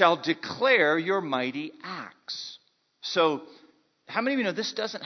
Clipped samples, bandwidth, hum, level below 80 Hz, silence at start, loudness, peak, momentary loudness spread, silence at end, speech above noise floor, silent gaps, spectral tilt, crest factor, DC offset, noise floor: under 0.1%; 6.4 kHz; none; -78 dBFS; 0 s; -27 LUFS; -4 dBFS; 17 LU; 0 s; 34 dB; none; -4 dB/octave; 24 dB; under 0.1%; -60 dBFS